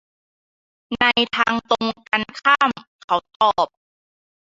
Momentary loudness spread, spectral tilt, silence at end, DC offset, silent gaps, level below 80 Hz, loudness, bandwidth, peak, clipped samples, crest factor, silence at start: 7 LU; -3.5 dB/octave; 0.8 s; under 0.1%; 2.87-3.08 s, 3.36-3.40 s; -58 dBFS; -19 LUFS; 7.8 kHz; -2 dBFS; under 0.1%; 20 dB; 0.9 s